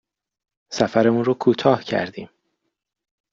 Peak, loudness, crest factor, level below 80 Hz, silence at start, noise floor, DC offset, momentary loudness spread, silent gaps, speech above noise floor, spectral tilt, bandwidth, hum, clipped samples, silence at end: -2 dBFS; -20 LUFS; 20 dB; -60 dBFS; 0.7 s; -75 dBFS; under 0.1%; 14 LU; none; 56 dB; -6 dB/octave; 7.6 kHz; none; under 0.1%; 1.05 s